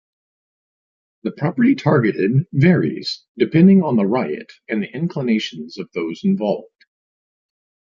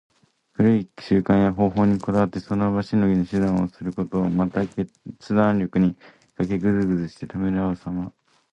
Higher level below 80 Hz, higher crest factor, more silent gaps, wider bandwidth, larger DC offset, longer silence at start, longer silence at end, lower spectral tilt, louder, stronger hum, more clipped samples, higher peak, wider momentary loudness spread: second, -60 dBFS vs -48 dBFS; about the same, 18 dB vs 16 dB; first, 3.28-3.35 s vs none; about the same, 7.4 kHz vs 8 kHz; neither; first, 1.25 s vs 0.6 s; first, 1.3 s vs 0.45 s; about the same, -8 dB/octave vs -9 dB/octave; first, -18 LUFS vs -22 LUFS; neither; neither; first, -2 dBFS vs -6 dBFS; first, 14 LU vs 11 LU